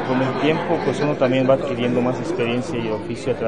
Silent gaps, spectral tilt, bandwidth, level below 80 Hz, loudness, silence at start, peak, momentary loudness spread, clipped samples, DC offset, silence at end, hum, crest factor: none; -6.5 dB/octave; 10.5 kHz; -52 dBFS; -21 LUFS; 0 s; -4 dBFS; 7 LU; under 0.1%; 0.9%; 0 s; none; 16 dB